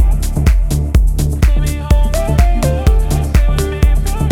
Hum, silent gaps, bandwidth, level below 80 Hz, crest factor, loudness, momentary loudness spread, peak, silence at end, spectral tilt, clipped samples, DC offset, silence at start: none; none; 16 kHz; -12 dBFS; 12 dB; -15 LUFS; 2 LU; 0 dBFS; 0 s; -6.5 dB/octave; under 0.1%; under 0.1%; 0 s